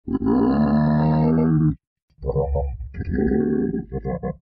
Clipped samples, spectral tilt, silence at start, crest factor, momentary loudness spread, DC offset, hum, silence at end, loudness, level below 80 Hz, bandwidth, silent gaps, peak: under 0.1%; -9.5 dB/octave; 0.05 s; 12 dB; 11 LU; under 0.1%; none; 0.05 s; -21 LUFS; -34 dBFS; 5 kHz; 1.87-1.96 s, 2.02-2.08 s; -8 dBFS